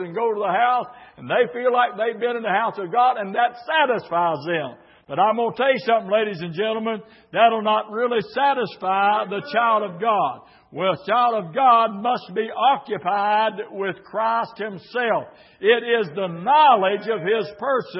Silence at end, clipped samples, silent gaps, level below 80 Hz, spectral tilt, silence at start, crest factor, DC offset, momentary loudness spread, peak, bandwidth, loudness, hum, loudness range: 0 s; under 0.1%; none; -72 dBFS; -9 dB/octave; 0 s; 18 dB; under 0.1%; 9 LU; -4 dBFS; 5.8 kHz; -21 LUFS; none; 3 LU